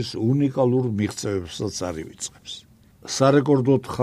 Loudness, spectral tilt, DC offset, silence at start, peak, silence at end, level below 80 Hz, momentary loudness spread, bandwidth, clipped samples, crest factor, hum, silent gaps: -22 LUFS; -6 dB/octave; under 0.1%; 0 s; -4 dBFS; 0 s; -54 dBFS; 17 LU; 14 kHz; under 0.1%; 18 dB; none; none